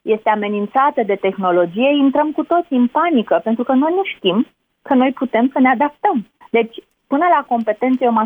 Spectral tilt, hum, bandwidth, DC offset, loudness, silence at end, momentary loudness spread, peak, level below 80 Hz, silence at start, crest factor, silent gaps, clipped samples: -8.5 dB/octave; none; 3.7 kHz; under 0.1%; -16 LUFS; 0 s; 5 LU; -4 dBFS; -64 dBFS; 0.05 s; 12 dB; none; under 0.1%